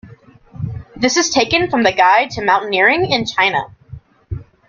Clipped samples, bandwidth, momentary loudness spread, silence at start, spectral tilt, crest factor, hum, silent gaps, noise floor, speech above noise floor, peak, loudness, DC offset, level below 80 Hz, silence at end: under 0.1%; 7.6 kHz; 17 LU; 0.05 s; -3.5 dB/octave; 16 dB; none; none; -43 dBFS; 28 dB; 0 dBFS; -14 LUFS; under 0.1%; -44 dBFS; 0.25 s